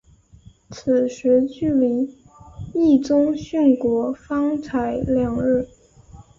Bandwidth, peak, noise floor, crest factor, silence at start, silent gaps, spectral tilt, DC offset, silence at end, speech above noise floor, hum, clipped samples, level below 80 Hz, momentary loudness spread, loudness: 7.6 kHz; -6 dBFS; -49 dBFS; 16 dB; 0.7 s; none; -7.5 dB/octave; under 0.1%; 0.2 s; 30 dB; none; under 0.1%; -48 dBFS; 11 LU; -20 LUFS